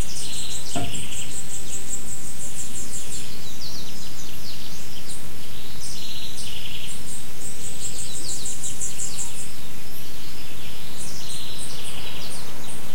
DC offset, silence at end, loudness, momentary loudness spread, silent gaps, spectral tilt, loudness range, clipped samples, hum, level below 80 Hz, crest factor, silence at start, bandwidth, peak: 30%; 0 s; -32 LUFS; 8 LU; none; -2.5 dB/octave; 4 LU; under 0.1%; none; -48 dBFS; 20 dB; 0 s; 16.5 kHz; -8 dBFS